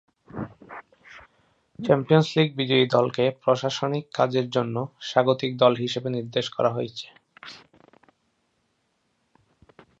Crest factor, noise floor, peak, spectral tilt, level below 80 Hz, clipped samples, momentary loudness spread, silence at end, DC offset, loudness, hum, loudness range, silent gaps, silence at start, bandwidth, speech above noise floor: 22 dB; -72 dBFS; -4 dBFS; -6 dB/octave; -66 dBFS; under 0.1%; 23 LU; 2.45 s; under 0.1%; -23 LUFS; none; 9 LU; none; 0.35 s; 8 kHz; 49 dB